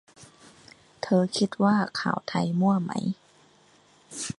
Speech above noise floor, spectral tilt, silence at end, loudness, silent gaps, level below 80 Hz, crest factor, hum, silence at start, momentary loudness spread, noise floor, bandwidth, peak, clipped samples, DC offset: 34 dB; -5.5 dB/octave; 0.05 s; -26 LUFS; none; -66 dBFS; 18 dB; none; 0.2 s; 13 LU; -59 dBFS; 11.5 kHz; -8 dBFS; under 0.1%; under 0.1%